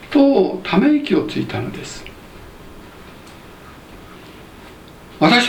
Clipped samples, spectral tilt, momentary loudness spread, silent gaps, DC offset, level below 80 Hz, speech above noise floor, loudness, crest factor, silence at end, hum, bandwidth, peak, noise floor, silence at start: under 0.1%; -5.5 dB/octave; 26 LU; none; under 0.1%; -46 dBFS; 24 dB; -17 LUFS; 20 dB; 0 s; none; 16.5 kHz; 0 dBFS; -40 dBFS; 0 s